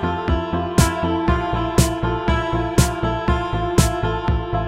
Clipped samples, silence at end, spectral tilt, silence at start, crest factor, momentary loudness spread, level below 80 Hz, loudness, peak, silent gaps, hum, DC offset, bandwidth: under 0.1%; 0 s; -5.5 dB/octave; 0 s; 16 dB; 4 LU; -26 dBFS; -20 LUFS; -2 dBFS; none; none; 0.1%; 16 kHz